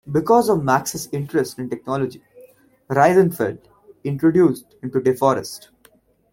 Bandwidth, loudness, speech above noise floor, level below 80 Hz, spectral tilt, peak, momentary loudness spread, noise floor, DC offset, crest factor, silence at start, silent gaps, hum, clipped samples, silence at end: 17 kHz; -19 LUFS; 37 dB; -56 dBFS; -6 dB/octave; -2 dBFS; 14 LU; -56 dBFS; under 0.1%; 18 dB; 0.05 s; none; none; under 0.1%; 0.75 s